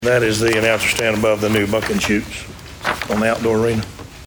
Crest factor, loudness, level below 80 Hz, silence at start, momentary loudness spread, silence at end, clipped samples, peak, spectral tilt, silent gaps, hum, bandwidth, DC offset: 18 dB; -17 LUFS; -40 dBFS; 0 s; 11 LU; 0 s; under 0.1%; 0 dBFS; -4.5 dB/octave; none; none; over 20 kHz; under 0.1%